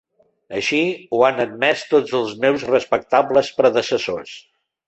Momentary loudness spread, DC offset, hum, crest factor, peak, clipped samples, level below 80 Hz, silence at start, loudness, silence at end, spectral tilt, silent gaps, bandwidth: 10 LU; under 0.1%; none; 18 dB; -2 dBFS; under 0.1%; -60 dBFS; 0.5 s; -18 LUFS; 0.5 s; -4.5 dB/octave; none; 8.4 kHz